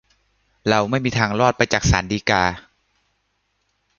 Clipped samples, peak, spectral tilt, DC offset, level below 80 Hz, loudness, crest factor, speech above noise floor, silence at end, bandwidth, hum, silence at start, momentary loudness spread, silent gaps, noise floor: under 0.1%; 0 dBFS; -4.5 dB/octave; under 0.1%; -36 dBFS; -19 LUFS; 22 dB; 51 dB; 1.4 s; 7.4 kHz; none; 0.65 s; 5 LU; none; -70 dBFS